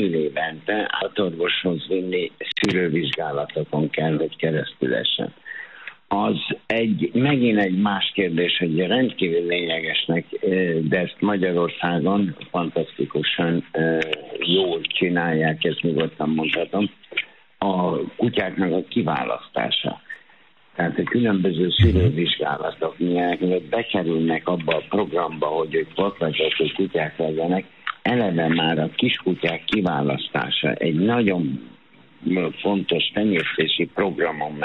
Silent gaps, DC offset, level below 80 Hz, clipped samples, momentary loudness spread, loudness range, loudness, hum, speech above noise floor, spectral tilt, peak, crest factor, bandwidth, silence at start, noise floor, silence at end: none; 0.1%; -46 dBFS; under 0.1%; 6 LU; 3 LU; -22 LUFS; none; 33 dB; -7.5 dB/octave; -6 dBFS; 16 dB; 8.8 kHz; 0 s; -55 dBFS; 0 s